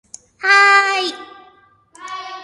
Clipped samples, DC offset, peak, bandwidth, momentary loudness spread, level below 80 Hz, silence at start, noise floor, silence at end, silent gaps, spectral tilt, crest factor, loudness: under 0.1%; under 0.1%; 0 dBFS; 11.5 kHz; 22 LU; -68 dBFS; 0.45 s; -51 dBFS; 0 s; none; 0.5 dB/octave; 18 dB; -13 LUFS